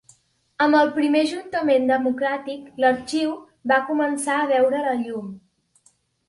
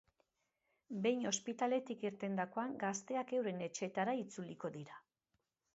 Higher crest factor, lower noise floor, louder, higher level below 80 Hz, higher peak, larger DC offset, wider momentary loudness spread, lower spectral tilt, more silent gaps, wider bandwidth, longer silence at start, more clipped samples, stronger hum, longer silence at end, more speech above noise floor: about the same, 18 dB vs 20 dB; second, -62 dBFS vs -87 dBFS; first, -21 LUFS vs -40 LUFS; first, -66 dBFS vs -86 dBFS; first, -4 dBFS vs -22 dBFS; neither; about the same, 11 LU vs 10 LU; about the same, -4 dB/octave vs -4.5 dB/octave; neither; first, 11.5 kHz vs 8 kHz; second, 0.6 s vs 0.9 s; neither; neither; first, 0.9 s vs 0.75 s; second, 41 dB vs 46 dB